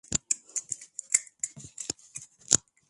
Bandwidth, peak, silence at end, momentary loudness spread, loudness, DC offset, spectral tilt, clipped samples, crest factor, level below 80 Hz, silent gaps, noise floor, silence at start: 12 kHz; -2 dBFS; 0.3 s; 14 LU; -30 LUFS; under 0.1%; -0.5 dB/octave; under 0.1%; 32 dB; -60 dBFS; none; -48 dBFS; 0.1 s